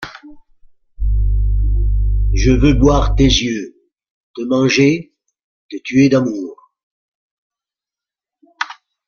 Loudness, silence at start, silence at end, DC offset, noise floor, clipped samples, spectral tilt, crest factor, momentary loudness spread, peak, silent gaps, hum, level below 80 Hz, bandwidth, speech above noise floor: -16 LUFS; 0 s; 0.35 s; under 0.1%; -89 dBFS; under 0.1%; -5.5 dB/octave; 16 dB; 16 LU; -2 dBFS; 4.11-4.34 s, 5.44-5.69 s, 6.83-7.50 s; none; -20 dBFS; 7 kHz; 76 dB